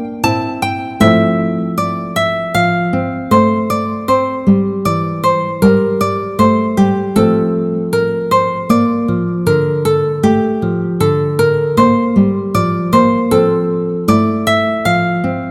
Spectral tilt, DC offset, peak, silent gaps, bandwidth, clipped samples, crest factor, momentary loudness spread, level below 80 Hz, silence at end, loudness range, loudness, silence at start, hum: -7 dB/octave; under 0.1%; 0 dBFS; none; 16 kHz; under 0.1%; 12 dB; 6 LU; -42 dBFS; 0 s; 1 LU; -14 LUFS; 0 s; none